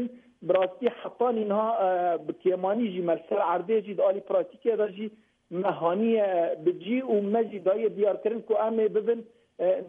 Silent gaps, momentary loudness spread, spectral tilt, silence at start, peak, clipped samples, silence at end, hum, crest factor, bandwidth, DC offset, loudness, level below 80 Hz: none; 6 LU; -9 dB/octave; 0 s; -12 dBFS; under 0.1%; 0 s; none; 16 dB; 3.8 kHz; under 0.1%; -27 LUFS; -78 dBFS